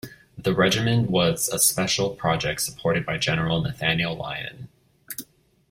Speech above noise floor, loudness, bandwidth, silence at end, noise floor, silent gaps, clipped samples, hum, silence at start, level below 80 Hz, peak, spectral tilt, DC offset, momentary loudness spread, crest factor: 26 dB; -23 LUFS; 16.5 kHz; 0.5 s; -49 dBFS; none; under 0.1%; none; 0.05 s; -50 dBFS; -6 dBFS; -3.5 dB/octave; under 0.1%; 16 LU; 20 dB